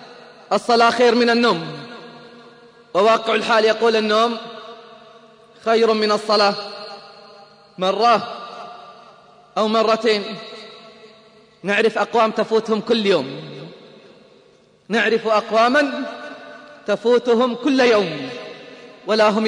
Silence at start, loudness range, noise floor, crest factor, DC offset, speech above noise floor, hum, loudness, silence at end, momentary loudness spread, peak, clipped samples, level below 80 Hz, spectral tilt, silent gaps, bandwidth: 0 s; 4 LU; -53 dBFS; 16 dB; under 0.1%; 36 dB; none; -18 LUFS; 0 s; 21 LU; -2 dBFS; under 0.1%; -70 dBFS; -4.5 dB/octave; none; 10.5 kHz